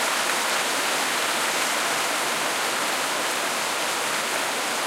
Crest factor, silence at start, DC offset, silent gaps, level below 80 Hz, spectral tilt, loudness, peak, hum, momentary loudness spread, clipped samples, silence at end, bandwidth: 14 dB; 0 s; under 0.1%; none; -74 dBFS; 0 dB/octave; -23 LUFS; -10 dBFS; none; 2 LU; under 0.1%; 0 s; 16 kHz